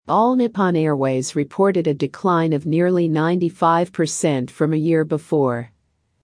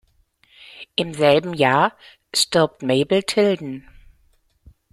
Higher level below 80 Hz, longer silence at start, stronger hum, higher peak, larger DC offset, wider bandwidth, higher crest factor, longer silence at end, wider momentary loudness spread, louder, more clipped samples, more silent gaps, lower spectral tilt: second, -66 dBFS vs -56 dBFS; second, 0.05 s vs 0.75 s; neither; about the same, -4 dBFS vs -2 dBFS; neither; second, 10.5 kHz vs 15.5 kHz; second, 14 dB vs 20 dB; second, 0.55 s vs 1.15 s; second, 4 LU vs 10 LU; about the same, -19 LUFS vs -19 LUFS; neither; neither; first, -6.5 dB/octave vs -4 dB/octave